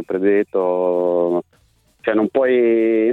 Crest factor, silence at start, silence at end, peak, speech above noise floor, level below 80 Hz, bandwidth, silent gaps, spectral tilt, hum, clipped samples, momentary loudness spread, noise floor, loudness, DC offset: 12 dB; 0 s; 0 s; -6 dBFS; 41 dB; -60 dBFS; 4.1 kHz; none; -8.5 dB/octave; none; under 0.1%; 6 LU; -58 dBFS; -18 LUFS; under 0.1%